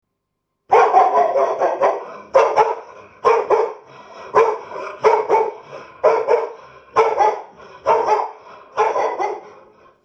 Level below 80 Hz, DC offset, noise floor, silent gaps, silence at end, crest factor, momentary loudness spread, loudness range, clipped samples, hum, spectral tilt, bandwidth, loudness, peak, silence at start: -64 dBFS; under 0.1%; -75 dBFS; none; 0.55 s; 18 dB; 15 LU; 3 LU; under 0.1%; none; -4 dB/octave; 8 kHz; -17 LUFS; 0 dBFS; 0.7 s